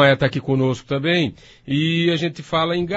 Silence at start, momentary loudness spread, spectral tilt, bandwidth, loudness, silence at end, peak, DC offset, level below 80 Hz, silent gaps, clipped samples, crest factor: 0 s; 5 LU; -6.5 dB/octave; 8 kHz; -20 LUFS; 0 s; -2 dBFS; under 0.1%; -52 dBFS; none; under 0.1%; 18 dB